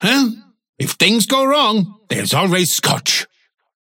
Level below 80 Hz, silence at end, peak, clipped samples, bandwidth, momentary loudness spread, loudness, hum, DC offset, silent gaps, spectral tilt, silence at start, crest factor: -62 dBFS; 0.55 s; -2 dBFS; under 0.1%; 17 kHz; 10 LU; -15 LUFS; none; under 0.1%; 0.69-0.73 s; -3 dB/octave; 0 s; 16 dB